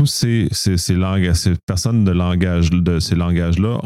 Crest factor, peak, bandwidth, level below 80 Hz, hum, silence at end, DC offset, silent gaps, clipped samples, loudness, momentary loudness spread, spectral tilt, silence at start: 12 dB; -4 dBFS; 15 kHz; -30 dBFS; none; 0 s; under 0.1%; 1.63-1.67 s; under 0.1%; -17 LUFS; 2 LU; -5.5 dB/octave; 0 s